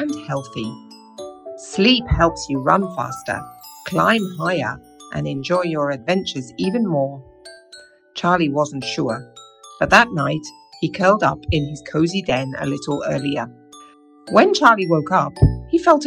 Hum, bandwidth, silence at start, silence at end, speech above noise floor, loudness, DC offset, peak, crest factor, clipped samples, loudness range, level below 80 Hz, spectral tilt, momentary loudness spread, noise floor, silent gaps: none; 16.5 kHz; 0 s; 0 s; 28 dB; -19 LUFS; under 0.1%; 0 dBFS; 20 dB; under 0.1%; 4 LU; -36 dBFS; -5.5 dB/octave; 17 LU; -46 dBFS; none